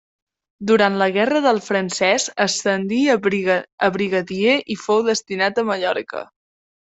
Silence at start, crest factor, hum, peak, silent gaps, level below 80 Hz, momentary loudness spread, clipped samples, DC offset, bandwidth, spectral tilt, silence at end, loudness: 0.6 s; 16 dB; none; -2 dBFS; 3.72-3.78 s; -62 dBFS; 5 LU; under 0.1%; under 0.1%; 8.2 kHz; -3.5 dB/octave; 0.75 s; -19 LUFS